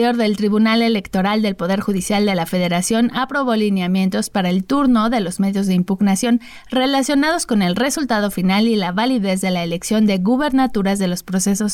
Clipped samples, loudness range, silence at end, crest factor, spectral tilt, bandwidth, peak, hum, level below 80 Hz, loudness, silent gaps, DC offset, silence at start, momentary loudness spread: under 0.1%; 1 LU; 0 s; 10 dB; -5 dB/octave; 16.5 kHz; -8 dBFS; none; -48 dBFS; -17 LUFS; none; under 0.1%; 0 s; 4 LU